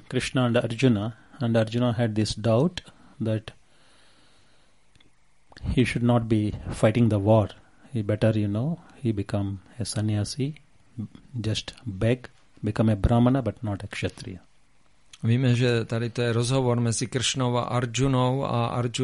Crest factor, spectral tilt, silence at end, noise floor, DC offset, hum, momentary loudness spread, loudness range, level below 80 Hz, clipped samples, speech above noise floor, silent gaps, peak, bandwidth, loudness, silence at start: 18 dB; -6 dB/octave; 0 s; -63 dBFS; 0.1%; none; 12 LU; 6 LU; -44 dBFS; under 0.1%; 39 dB; none; -6 dBFS; 11.5 kHz; -25 LUFS; 0.1 s